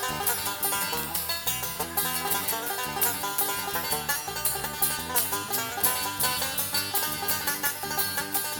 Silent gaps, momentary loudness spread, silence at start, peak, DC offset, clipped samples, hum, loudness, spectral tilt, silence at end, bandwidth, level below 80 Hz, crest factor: none; 3 LU; 0 s; -6 dBFS; under 0.1%; under 0.1%; none; -26 LUFS; -1 dB/octave; 0 s; over 20 kHz; -54 dBFS; 22 dB